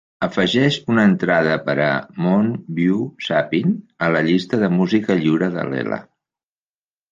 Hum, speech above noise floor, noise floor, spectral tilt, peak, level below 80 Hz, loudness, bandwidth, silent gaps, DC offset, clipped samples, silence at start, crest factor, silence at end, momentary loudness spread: none; over 72 dB; under -90 dBFS; -7 dB/octave; -2 dBFS; -58 dBFS; -19 LUFS; 7.6 kHz; none; under 0.1%; under 0.1%; 0.2 s; 16 dB; 1.1 s; 7 LU